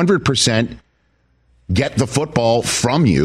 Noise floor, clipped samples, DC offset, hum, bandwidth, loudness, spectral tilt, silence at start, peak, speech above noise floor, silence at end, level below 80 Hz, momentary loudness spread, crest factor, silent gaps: -61 dBFS; under 0.1%; under 0.1%; none; 15 kHz; -17 LUFS; -4.5 dB/octave; 0 s; -4 dBFS; 45 dB; 0 s; -40 dBFS; 5 LU; 14 dB; none